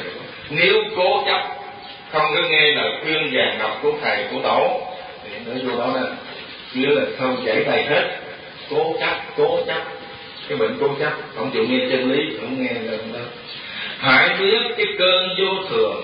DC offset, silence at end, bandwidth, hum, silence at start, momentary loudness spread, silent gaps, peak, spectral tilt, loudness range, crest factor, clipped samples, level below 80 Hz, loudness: under 0.1%; 0 s; 5.2 kHz; none; 0 s; 17 LU; none; -2 dBFS; -9 dB/octave; 4 LU; 18 dB; under 0.1%; -60 dBFS; -19 LUFS